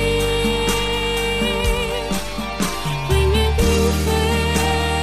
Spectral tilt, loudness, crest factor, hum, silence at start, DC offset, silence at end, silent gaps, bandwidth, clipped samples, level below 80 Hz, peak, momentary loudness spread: -4.5 dB/octave; -19 LUFS; 12 dB; none; 0 s; 0.9%; 0 s; none; 14 kHz; under 0.1%; -26 dBFS; -6 dBFS; 6 LU